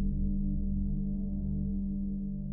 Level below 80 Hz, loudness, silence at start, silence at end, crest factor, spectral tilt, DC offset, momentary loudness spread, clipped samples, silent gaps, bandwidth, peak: -34 dBFS; -34 LUFS; 0 s; 0 s; 12 dB; -18.5 dB/octave; under 0.1%; 2 LU; under 0.1%; none; 0.9 kHz; -20 dBFS